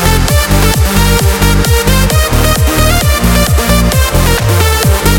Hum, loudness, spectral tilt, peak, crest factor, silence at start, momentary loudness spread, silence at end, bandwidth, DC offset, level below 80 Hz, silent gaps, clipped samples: none; -9 LUFS; -4.5 dB/octave; 0 dBFS; 8 dB; 0 s; 1 LU; 0 s; 18.5 kHz; under 0.1%; -12 dBFS; none; 0.2%